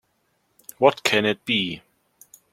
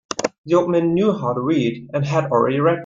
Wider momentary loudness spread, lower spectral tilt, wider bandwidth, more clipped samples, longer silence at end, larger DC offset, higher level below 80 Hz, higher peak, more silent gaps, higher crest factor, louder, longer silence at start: first, 10 LU vs 7 LU; second, -3.5 dB/octave vs -6.5 dB/octave; first, 16.5 kHz vs 7.6 kHz; neither; first, 0.75 s vs 0 s; neither; second, -66 dBFS vs -58 dBFS; about the same, -2 dBFS vs -2 dBFS; second, none vs 0.38-0.44 s; first, 22 dB vs 16 dB; about the same, -21 LUFS vs -19 LUFS; first, 0.8 s vs 0.1 s